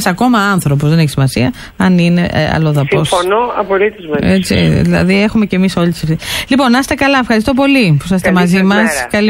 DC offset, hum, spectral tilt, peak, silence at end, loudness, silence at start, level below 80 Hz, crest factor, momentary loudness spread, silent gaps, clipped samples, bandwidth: under 0.1%; none; -6 dB/octave; 0 dBFS; 0 s; -11 LUFS; 0 s; -34 dBFS; 10 dB; 5 LU; none; under 0.1%; 16.5 kHz